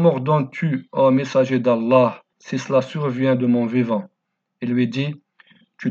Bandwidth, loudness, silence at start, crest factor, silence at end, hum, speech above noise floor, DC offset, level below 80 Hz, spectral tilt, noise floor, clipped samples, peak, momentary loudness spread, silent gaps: 7.4 kHz; -20 LUFS; 0 s; 16 dB; 0 s; none; 36 dB; under 0.1%; -76 dBFS; -7.5 dB/octave; -55 dBFS; under 0.1%; -4 dBFS; 12 LU; none